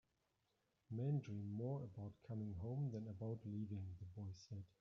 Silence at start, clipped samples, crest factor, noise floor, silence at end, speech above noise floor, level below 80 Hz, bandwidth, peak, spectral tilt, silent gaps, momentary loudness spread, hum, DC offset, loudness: 0.9 s; under 0.1%; 16 dB; -86 dBFS; 0.15 s; 38 dB; -78 dBFS; 7 kHz; -32 dBFS; -10 dB/octave; none; 10 LU; none; under 0.1%; -49 LUFS